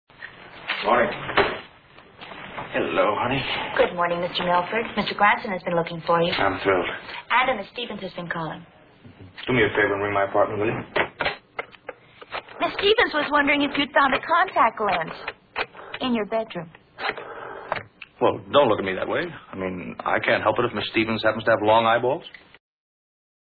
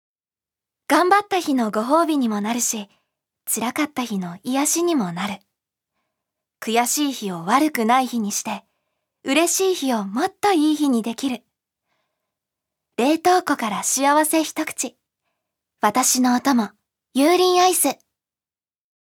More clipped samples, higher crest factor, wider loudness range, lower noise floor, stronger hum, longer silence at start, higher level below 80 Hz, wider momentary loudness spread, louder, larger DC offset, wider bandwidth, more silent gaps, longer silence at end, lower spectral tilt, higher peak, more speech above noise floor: neither; about the same, 20 dB vs 20 dB; about the same, 4 LU vs 4 LU; second, -50 dBFS vs under -90 dBFS; neither; second, 0.2 s vs 0.9 s; first, -54 dBFS vs -74 dBFS; first, 16 LU vs 11 LU; second, -23 LUFS vs -20 LUFS; neither; second, 4.9 kHz vs 19 kHz; neither; first, 1.25 s vs 1.1 s; first, -8 dB/octave vs -3 dB/octave; about the same, -4 dBFS vs -2 dBFS; second, 27 dB vs over 70 dB